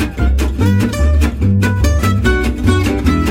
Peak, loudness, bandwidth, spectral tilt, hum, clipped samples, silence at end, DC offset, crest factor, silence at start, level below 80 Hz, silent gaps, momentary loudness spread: 0 dBFS; -14 LUFS; 16 kHz; -6.5 dB/octave; none; under 0.1%; 0 s; under 0.1%; 12 dB; 0 s; -16 dBFS; none; 1 LU